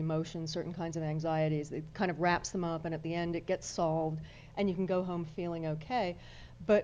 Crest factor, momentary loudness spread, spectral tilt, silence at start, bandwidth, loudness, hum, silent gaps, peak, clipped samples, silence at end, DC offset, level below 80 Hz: 18 dB; 7 LU; -6 dB/octave; 0 s; 9.6 kHz; -35 LUFS; none; none; -16 dBFS; under 0.1%; 0 s; under 0.1%; -58 dBFS